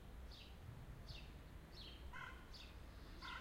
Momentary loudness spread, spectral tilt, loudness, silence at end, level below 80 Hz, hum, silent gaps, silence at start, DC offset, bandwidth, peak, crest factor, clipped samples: 5 LU; -4.5 dB/octave; -57 LUFS; 0 s; -58 dBFS; none; none; 0 s; under 0.1%; 16 kHz; -40 dBFS; 14 dB; under 0.1%